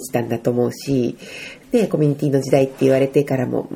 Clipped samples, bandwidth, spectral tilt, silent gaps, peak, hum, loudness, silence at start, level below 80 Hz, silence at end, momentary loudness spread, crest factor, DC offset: under 0.1%; 16.5 kHz; -7 dB/octave; none; -2 dBFS; none; -19 LUFS; 0 s; -54 dBFS; 0 s; 8 LU; 16 dB; under 0.1%